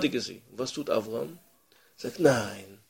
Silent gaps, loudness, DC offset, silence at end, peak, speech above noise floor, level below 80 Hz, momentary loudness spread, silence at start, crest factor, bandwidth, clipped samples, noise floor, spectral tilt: none; -30 LUFS; under 0.1%; 0.15 s; -6 dBFS; 34 dB; -66 dBFS; 15 LU; 0 s; 24 dB; 16.5 kHz; under 0.1%; -63 dBFS; -4.5 dB/octave